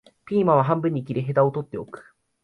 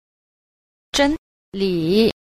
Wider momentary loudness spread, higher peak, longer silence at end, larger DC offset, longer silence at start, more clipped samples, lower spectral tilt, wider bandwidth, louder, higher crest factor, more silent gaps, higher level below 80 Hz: first, 15 LU vs 11 LU; about the same, -6 dBFS vs -4 dBFS; first, 0.4 s vs 0.15 s; neither; second, 0.3 s vs 0.95 s; neither; first, -10 dB/octave vs -5 dB/octave; second, 4.9 kHz vs 15 kHz; about the same, -22 LUFS vs -20 LUFS; about the same, 18 dB vs 18 dB; second, none vs 1.18-1.52 s; second, -62 dBFS vs -44 dBFS